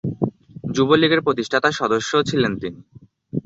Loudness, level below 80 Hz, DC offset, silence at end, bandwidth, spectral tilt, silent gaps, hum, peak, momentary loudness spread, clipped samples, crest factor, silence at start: -19 LUFS; -52 dBFS; under 0.1%; 0.05 s; 8 kHz; -5 dB/octave; none; none; -2 dBFS; 14 LU; under 0.1%; 18 dB; 0.05 s